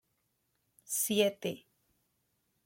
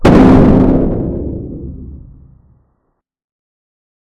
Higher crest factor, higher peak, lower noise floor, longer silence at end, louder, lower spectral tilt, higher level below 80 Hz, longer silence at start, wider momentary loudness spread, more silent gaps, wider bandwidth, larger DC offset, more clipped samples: first, 22 dB vs 12 dB; second, -14 dBFS vs 0 dBFS; first, -79 dBFS vs -66 dBFS; second, 1.05 s vs 2.05 s; second, -32 LUFS vs -10 LUFS; second, -3 dB/octave vs -9 dB/octave; second, -80 dBFS vs -22 dBFS; first, 0.9 s vs 0 s; second, 12 LU vs 22 LU; neither; first, 16.5 kHz vs 9 kHz; neither; second, under 0.1% vs 1%